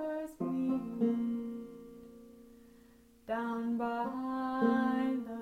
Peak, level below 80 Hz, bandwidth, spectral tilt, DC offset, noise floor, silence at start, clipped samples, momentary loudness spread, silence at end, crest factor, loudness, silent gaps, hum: -18 dBFS; -70 dBFS; 13 kHz; -7.5 dB/octave; under 0.1%; -61 dBFS; 0 s; under 0.1%; 21 LU; 0 s; 16 dB; -34 LUFS; none; none